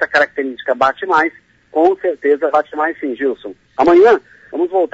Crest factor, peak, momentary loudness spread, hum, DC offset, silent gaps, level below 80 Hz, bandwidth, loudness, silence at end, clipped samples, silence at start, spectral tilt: 14 dB; -2 dBFS; 11 LU; none; under 0.1%; none; -56 dBFS; 7.8 kHz; -15 LUFS; 0.05 s; under 0.1%; 0 s; -5 dB/octave